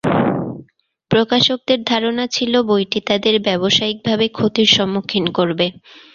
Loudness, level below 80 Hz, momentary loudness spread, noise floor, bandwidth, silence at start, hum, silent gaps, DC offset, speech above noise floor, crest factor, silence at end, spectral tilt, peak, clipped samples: -16 LUFS; -52 dBFS; 6 LU; -51 dBFS; 7.4 kHz; 0.05 s; none; none; under 0.1%; 34 dB; 16 dB; 0.4 s; -4.5 dB/octave; 0 dBFS; under 0.1%